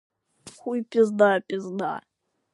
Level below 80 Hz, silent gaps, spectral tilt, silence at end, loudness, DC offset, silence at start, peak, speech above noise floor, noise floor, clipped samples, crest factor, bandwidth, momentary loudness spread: -74 dBFS; none; -6 dB/octave; 0.55 s; -24 LUFS; under 0.1%; 0.45 s; -6 dBFS; 27 dB; -50 dBFS; under 0.1%; 20 dB; 11.5 kHz; 15 LU